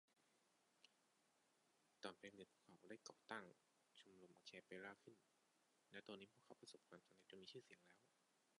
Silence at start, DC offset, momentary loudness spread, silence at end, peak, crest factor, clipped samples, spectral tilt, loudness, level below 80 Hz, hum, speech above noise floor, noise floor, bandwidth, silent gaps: 0.1 s; under 0.1%; 11 LU; 0 s; -36 dBFS; 30 dB; under 0.1%; -3.5 dB/octave; -62 LUFS; under -90 dBFS; none; 21 dB; -84 dBFS; 11 kHz; none